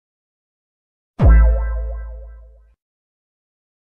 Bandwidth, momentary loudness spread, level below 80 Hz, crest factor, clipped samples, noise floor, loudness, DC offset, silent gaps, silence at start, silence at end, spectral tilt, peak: 2.8 kHz; 22 LU; -20 dBFS; 16 dB; under 0.1%; -43 dBFS; -16 LUFS; under 0.1%; none; 1.2 s; 1.5 s; -10.5 dB/octave; -4 dBFS